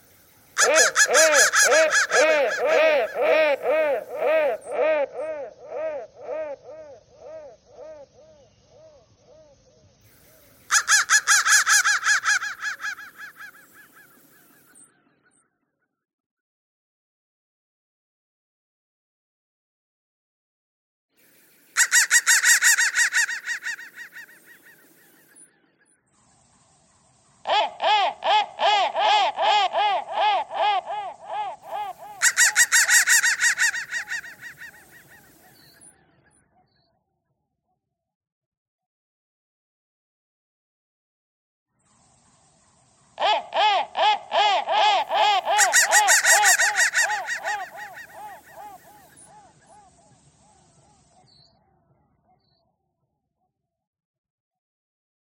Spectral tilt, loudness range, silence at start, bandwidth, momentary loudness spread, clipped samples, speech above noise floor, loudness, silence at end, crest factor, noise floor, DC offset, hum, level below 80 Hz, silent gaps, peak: 2 dB/octave; 17 LU; 0.55 s; 16.5 kHz; 20 LU; under 0.1%; 58 dB; -19 LUFS; 6.5 s; 22 dB; -78 dBFS; under 0.1%; none; -74 dBFS; 16.13-21.09 s, 38.15-38.21 s, 38.32-38.79 s, 38.86-41.66 s; -2 dBFS